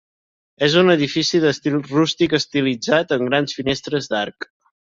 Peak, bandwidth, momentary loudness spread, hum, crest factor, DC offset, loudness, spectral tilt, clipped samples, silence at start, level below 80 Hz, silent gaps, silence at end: -2 dBFS; 7.8 kHz; 9 LU; none; 18 dB; under 0.1%; -18 LUFS; -5 dB/octave; under 0.1%; 0.6 s; -56 dBFS; none; 0.55 s